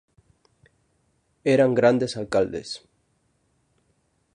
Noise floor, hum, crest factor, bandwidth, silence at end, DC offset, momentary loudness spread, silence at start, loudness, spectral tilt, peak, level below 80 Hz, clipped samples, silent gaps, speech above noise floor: -69 dBFS; none; 20 dB; 11 kHz; 1.6 s; under 0.1%; 16 LU; 1.45 s; -22 LUFS; -6 dB/octave; -6 dBFS; -60 dBFS; under 0.1%; none; 47 dB